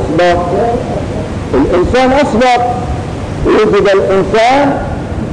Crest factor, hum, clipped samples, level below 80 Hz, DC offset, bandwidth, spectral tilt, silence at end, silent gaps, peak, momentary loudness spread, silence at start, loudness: 6 dB; none; under 0.1%; -26 dBFS; under 0.1%; 10.5 kHz; -6.5 dB/octave; 0 s; none; -4 dBFS; 10 LU; 0 s; -11 LUFS